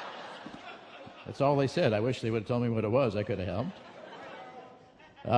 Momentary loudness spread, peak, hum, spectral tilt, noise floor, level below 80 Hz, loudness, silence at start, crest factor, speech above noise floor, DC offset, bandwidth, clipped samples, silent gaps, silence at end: 20 LU; -12 dBFS; none; -7 dB/octave; -55 dBFS; -64 dBFS; -30 LUFS; 0 s; 20 dB; 26 dB; under 0.1%; 10.5 kHz; under 0.1%; none; 0 s